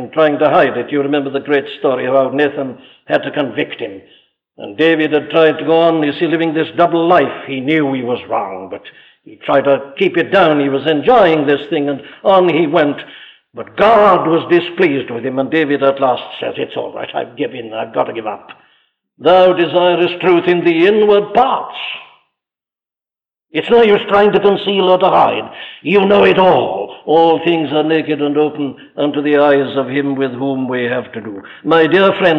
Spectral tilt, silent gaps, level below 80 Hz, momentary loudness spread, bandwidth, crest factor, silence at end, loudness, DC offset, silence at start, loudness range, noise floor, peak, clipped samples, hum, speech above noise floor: -7.5 dB/octave; none; -54 dBFS; 14 LU; 6.4 kHz; 12 dB; 0 s; -13 LUFS; under 0.1%; 0 s; 5 LU; under -90 dBFS; -2 dBFS; under 0.1%; none; over 77 dB